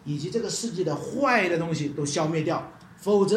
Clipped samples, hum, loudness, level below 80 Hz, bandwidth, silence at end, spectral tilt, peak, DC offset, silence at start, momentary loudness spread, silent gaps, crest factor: under 0.1%; none; -26 LUFS; -64 dBFS; 15 kHz; 0 s; -5 dB/octave; -8 dBFS; under 0.1%; 0.05 s; 8 LU; none; 16 dB